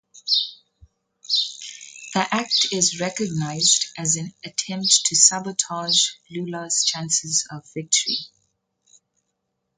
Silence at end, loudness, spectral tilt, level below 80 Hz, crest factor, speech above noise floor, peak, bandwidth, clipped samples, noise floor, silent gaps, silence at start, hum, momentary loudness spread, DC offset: 1.5 s; -20 LUFS; -1 dB/octave; -66 dBFS; 24 dB; 54 dB; 0 dBFS; 10.5 kHz; under 0.1%; -77 dBFS; none; 0.15 s; none; 14 LU; under 0.1%